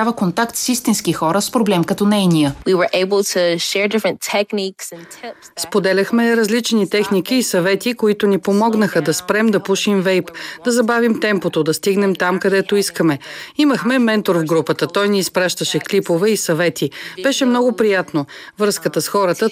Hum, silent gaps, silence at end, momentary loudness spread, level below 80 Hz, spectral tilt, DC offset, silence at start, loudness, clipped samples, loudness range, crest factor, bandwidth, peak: none; none; 0 s; 6 LU; -56 dBFS; -4.5 dB/octave; under 0.1%; 0 s; -16 LUFS; under 0.1%; 2 LU; 14 dB; 16 kHz; -2 dBFS